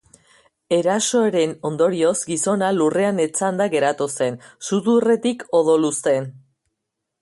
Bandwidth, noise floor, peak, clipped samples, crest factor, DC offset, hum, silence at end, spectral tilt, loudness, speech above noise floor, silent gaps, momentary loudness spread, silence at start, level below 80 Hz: 11.5 kHz; -79 dBFS; -6 dBFS; under 0.1%; 14 dB; under 0.1%; none; 0.85 s; -4.5 dB/octave; -19 LUFS; 60 dB; none; 6 LU; 0.7 s; -66 dBFS